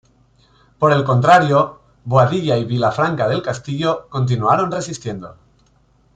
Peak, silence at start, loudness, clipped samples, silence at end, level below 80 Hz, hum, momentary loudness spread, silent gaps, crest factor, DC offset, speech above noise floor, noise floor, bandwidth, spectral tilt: -2 dBFS; 0.8 s; -17 LUFS; under 0.1%; 0.85 s; -52 dBFS; none; 13 LU; none; 16 dB; under 0.1%; 40 dB; -56 dBFS; 9.2 kHz; -6.5 dB/octave